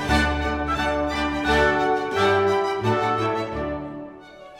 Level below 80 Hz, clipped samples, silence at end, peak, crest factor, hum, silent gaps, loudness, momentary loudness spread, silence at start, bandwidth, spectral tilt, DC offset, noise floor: -36 dBFS; under 0.1%; 0 s; -8 dBFS; 16 dB; none; none; -22 LUFS; 11 LU; 0 s; 16 kHz; -5.5 dB/octave; under 0.1%; -43 dBFS